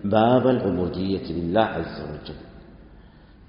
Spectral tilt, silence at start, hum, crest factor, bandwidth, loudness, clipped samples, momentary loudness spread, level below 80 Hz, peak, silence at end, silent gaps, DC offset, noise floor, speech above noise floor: -6 dB/octave; 0 s; none; 20 dB; 5.4 kHz; -22 LUFS; under 0.1%; 18 LU; -48 dBFS; -4 dBFS; 0.4 s; none; under 0.1%; -48 dBFS; 26 dB